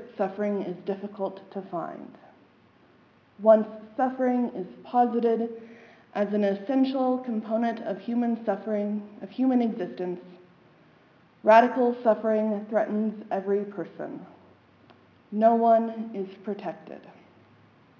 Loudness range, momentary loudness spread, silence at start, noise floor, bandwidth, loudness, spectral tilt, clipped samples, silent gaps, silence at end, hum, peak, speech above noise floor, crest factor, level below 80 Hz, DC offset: 5 LU; 17 LU; 0 s; -59 dBFS; 6.8 kHz; -26 LUFS; -8.5 dB/octave; under 0.1%; none; 0.9 s; none; -4 dBFS; 33 dB; 22 dB; -80 dBFS; under 0.1%